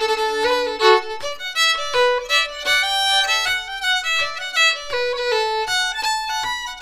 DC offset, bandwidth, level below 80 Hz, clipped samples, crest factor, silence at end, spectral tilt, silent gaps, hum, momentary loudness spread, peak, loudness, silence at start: under 0.1%; 15.5 kHz; -50 dBFS; under 0.1%; 20 dB; 0 s; 0.5 dB/octave; none; none; 7 LU; 0 dBFS; -18 LUFS; 0 s